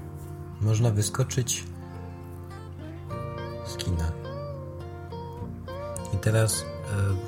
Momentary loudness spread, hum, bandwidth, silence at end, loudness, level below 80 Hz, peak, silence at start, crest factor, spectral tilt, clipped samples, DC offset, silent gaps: 16 LU; none; 16.5 kHz; 0 s; -30 LUFS; -46 dBFS; -10 dBFS; 0 s; 18 dB; -5 dB/octave; under 0.1%; under 0.1%; none